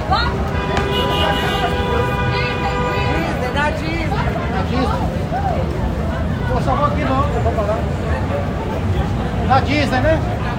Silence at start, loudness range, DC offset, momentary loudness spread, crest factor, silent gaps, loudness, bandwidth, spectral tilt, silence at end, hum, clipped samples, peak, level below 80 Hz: 0 s; 1 LU; under 0.1%; 4 LU; 16 dB; none; -18 LUFS; 16 kHz; -6.5 dB/octave; 0 s; none; under 0.1%; -2 dBFS; -26 dBFS